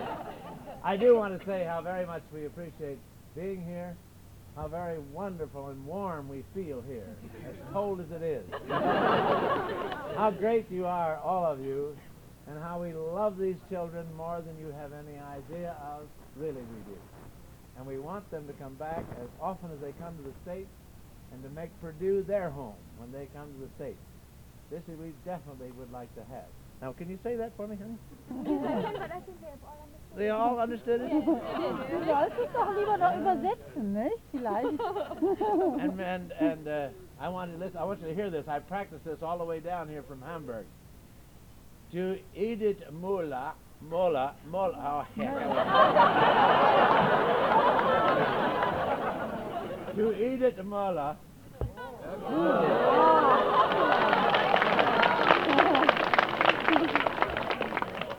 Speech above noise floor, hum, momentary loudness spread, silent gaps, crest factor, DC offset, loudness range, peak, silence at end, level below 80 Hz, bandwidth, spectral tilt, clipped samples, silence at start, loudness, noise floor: 22 dB; none; 21 LU; none; 28 dB; under 0.1%; 17 LU; -2 dBFS; 0 s; -56 dBFS; 19.5 kHz; -6 dB/octave; under 0.1%; 0 s; -29 LUFS; -52 dBFS